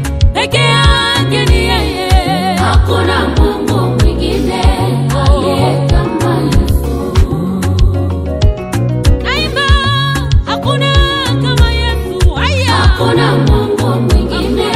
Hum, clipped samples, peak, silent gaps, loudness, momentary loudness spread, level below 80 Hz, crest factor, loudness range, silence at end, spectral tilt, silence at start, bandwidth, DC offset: none; 0.2%; 0 dBFS; none; -12 LUFS; 4 LU; -16 dBFS; 10 dB; 2 LU; 0 s; -5.5 dB/octave; 0 s; 14.5 kHz; under 0.1%